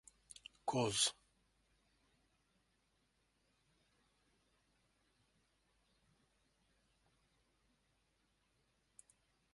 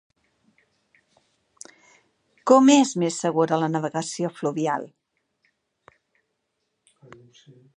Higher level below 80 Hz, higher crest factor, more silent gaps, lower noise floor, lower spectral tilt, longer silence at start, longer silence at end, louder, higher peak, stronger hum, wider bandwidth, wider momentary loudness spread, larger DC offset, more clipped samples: about the same, -80 dBFS vs -76 dBFS; about the same, 28 dB vs 24 dB; neither; first, -81 dBFS vs -77 dBFS; second, -2.5 dB/octave vs -5 dB/octave; second, 0.65 s vs 2.45 s; first, 8.4 s vs 2.9 s; second, -38 LUFS vs -21 LUFS; second, -22 dBFS vs -2 dBFS; neither; about the same, 11.5 kHz vs 11 kHz; second, 22 LU vs 28 LU; neither; neither